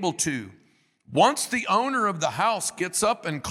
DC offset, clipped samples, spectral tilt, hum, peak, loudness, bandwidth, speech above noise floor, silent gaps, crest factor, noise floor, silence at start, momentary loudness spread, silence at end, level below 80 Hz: under 0.1%; under 0.1%; -3 dB/octave; none; -6 dBFS; -24 LUFS; 16 kHz; 38 dB; none; 20 dB; -63 dBFS; 0 s; 8 LU; 0 s; -62 dBFS